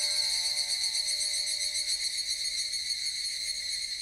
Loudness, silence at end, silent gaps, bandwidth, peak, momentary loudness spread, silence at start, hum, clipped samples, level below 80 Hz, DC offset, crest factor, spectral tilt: -28 LUFS; 0 s; none; 16 kHz; -16 dBFS; 4 LU; 0 s; none; under 0.1%; -64 dBFS; under 0.1%; 14 dB; 3.5 dB/octave